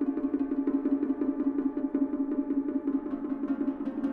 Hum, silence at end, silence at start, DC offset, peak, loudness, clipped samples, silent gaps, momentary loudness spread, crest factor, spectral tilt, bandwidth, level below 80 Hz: none; 0 s; 0 s; under 0.1%; -16 dBFS; -30 LUFS; under 0.1%; none; 4 LU; 12 dB; -9.5 dB/octave; 3.1 kHz; -60 dBFS